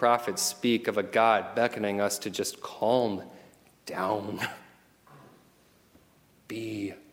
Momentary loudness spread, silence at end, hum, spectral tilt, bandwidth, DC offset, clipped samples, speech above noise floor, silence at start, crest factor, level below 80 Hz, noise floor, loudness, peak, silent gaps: 14 LU; 0.1 s; none; -3.5 dB/octave; 17 kHz; under 0.1%; under 0.1%; 34 dB; 0 s; 22 dB; -74 dBFS; -62 dBFS; -29 LUFS; -8 dBFS; none